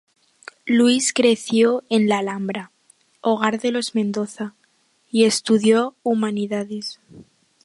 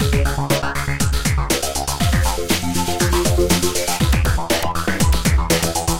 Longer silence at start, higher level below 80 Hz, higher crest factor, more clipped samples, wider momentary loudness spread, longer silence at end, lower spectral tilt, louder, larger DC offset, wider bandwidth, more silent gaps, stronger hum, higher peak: first, 0.65 s vs 0 s; second, -70 dBFS vs -24 dBFS; about the same, 20 dB vs 16 dB; neither; first, 13 LU vs 3 LU; first, 0.4 s vs 0 s; about the same, -4 dB/octave vs -4 dB/octave; about the same, -20 LUFS vs -18 LUFS; second, under 0.1% vs 3%; second, 11.5 kHz vs 17 kHz; neither; neither; about the same, -2 dBFS vs -2 dBFS